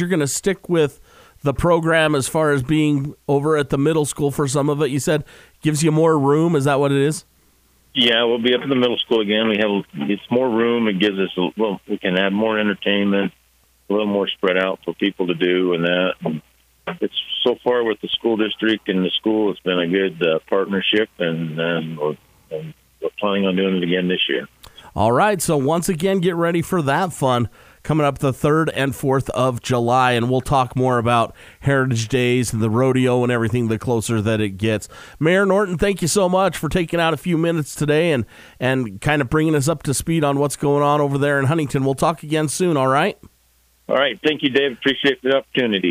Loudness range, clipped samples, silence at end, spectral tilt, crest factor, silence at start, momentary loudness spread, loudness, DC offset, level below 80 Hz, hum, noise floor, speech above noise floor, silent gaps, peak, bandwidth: 2 LU; under 0.1%; 0 s; -5 dB/octave; 16 dB; 0 s; 7 LU; -19 LUFS; under 0.1%; -46 dBFS; none; -58 dBFS; 40 dB; none; -4 dBFS; 15.5 kHz